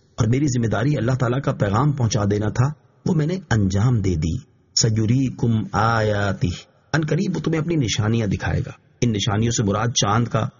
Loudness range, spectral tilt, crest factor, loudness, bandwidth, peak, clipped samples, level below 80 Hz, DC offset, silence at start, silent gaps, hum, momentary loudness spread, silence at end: 2 LU; -6 dB/octave; 16 dB; -21 LUFS; 7.4 kHz; -4 dBFS; under 0.1%; -42 dBFS; under 0.1%; 0.2 s; none; none; 6 LU; 0.1 s